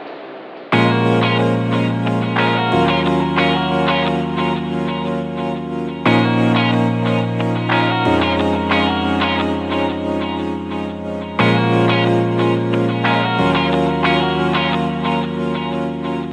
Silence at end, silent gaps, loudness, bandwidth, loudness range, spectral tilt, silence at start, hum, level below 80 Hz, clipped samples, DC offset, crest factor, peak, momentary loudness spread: 0 s; none; -17 LUFS; 9.6 kHz; 2 LU; -7 dB/octave; 0 s; none; -42 dBFS; under 0.1%; under 0.1%; 16 dB; 0 dBFS; 8 LU